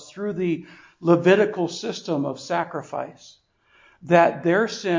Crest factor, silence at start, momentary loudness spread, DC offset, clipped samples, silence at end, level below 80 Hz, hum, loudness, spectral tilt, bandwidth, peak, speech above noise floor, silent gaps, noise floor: 20 dB; 0 s; 13 LU; under 0.1%; under 0.1%; 0 s; -68 dBFS; none; -22 LUFS; -6 dB/octave; 7.6 kHz; -4 dBFS; 36 dB; none; -58 dBFS